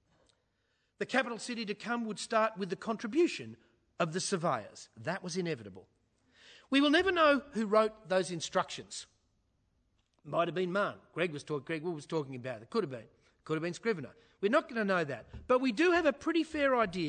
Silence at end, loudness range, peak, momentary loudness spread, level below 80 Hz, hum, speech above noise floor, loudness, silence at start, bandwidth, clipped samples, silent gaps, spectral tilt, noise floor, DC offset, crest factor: 0 s; 6 LU; -14 dBFS; 14 LU; -68 dBFS; none; 45 dB; -33 LUFS; 1 s; 9.4 kHz; under 0.1%; none; -4.5 dB/octave; -78 dBFS; under 0.1%; 20 dB